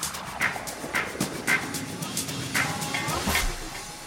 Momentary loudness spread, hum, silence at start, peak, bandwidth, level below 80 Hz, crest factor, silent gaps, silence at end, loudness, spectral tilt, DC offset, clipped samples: 7 LU; none; 0 s; -10 dBFS; 18 kHz; -42 dBFS; 18 dB; none; 0 s; -28 LUFS; -2.5 dB/octave; under 0.1%; under 0.1%